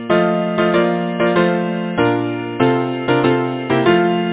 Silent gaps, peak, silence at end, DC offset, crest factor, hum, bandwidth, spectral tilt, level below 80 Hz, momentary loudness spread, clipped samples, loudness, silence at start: none; 0 dBFS; 0 s; under 0.1%; 16 dB; none; 4 kHz; -10.5 dB/octave; -50 dBFS; 5 LU; under 0.1%; -16 LUFS; 0 s